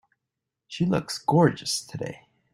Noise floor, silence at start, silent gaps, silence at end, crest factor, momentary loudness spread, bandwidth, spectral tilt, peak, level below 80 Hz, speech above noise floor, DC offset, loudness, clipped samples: -85 dBFS; 0.7 s; none; 0.4 s; 20 dB; 15 LU; 16 kHz; -5.5 dB/octave; -6 dBFS; -62 dBFS; 60 dB; under 0.1%; -25 LUFS; under 0.1%